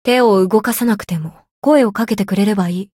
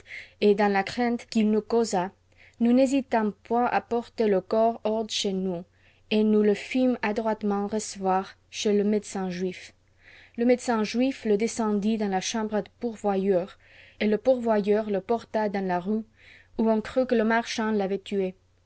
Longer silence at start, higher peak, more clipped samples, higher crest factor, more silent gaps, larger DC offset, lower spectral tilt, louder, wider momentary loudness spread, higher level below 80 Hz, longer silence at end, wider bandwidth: about the same, 0.05 s vs 0.1 s; first, -2 dBFS vs -10 dBFS; neither; about the same, 12 dB vs 16 dB; first, 1.51-1.62 s vs none; neither; about the same, -6 dB/octave vs -5.5 dB/octave; first, -15 LUFS vs -26 LUFS; about the same, 10 LU vs 8 LU; first, -54 dBFS vs -60 dBFS; second, 0.15 s vs 0.35 s; first, 17 kHz vs 8 kHz